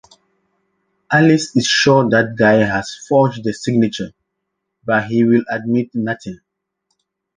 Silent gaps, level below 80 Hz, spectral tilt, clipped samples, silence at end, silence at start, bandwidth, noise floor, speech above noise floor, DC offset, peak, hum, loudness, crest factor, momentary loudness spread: none; -54 dBFS; -5 dB/octave; under 0.1%; 1.05 s; 1.1 s; 9.8 kHz; -75 dBFS; 60 dB; under 0.1%; -2 dBFS; none; -15 LUFS; 16 dB; 11 LU